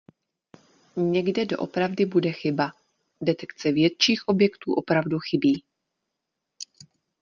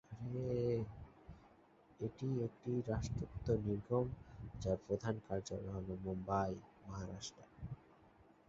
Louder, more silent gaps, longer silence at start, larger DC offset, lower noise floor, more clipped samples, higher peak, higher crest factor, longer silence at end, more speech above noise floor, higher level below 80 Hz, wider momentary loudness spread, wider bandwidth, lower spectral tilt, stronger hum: first, -24 LUFS vs -42 LUFS; neither; first, 0.95 s vs 0.1 s; neither; first, -82 dBFS vs -67 dBFS; neither; first, -6 dBFS vs -22 dBFS; about the same, 20 dB vs 20 dB; first, 0.55 s vs 0.4 s; first, 59 dB vs 26 dB; second, -66 dBFS vs -58 dBFS; second, 9 LU vs 14 LU; about the same, 7.4 kHz vs 7.6 kHz; second, -5.5 dB/octave vs -7.5 dB/octave; neither